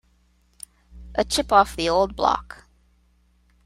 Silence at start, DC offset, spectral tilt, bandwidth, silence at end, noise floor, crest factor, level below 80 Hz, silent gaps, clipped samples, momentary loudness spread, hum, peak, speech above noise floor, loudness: 0.95 s; under 0.1%; -3.5 dB/octave; 16 kHz; 1.2 s; -62 dBFS; 22 dB; -44 dBFS; none; under 0.1%; 25 LU; none; -2 dBFS; 41 dB; -21 LUFS